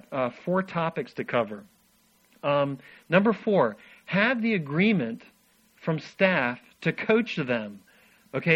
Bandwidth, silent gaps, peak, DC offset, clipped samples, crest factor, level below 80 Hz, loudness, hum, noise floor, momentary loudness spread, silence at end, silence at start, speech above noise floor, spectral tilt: 8.4 kHz; none; -6 dBFS; under 0.1%; under 0.1%; 20 dB; -68 dBFS; -26 LUFS; none; -64 dBFS; 11 LU; 0 s; 0.1 s; 38 dB; -7.5 dB/octave